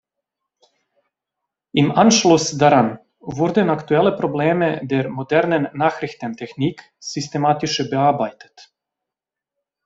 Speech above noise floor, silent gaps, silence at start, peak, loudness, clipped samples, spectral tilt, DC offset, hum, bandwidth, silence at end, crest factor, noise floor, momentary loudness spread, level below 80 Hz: 69 dB; none; 1.75 s; 0 dBFS; -18 LUFS; under 0.1%; -5 dB/octave; under 0.1%; none; 8.2 kHz; 1.25 s; 20 dB; -87 dBFS; 13 LU; -58 dBFS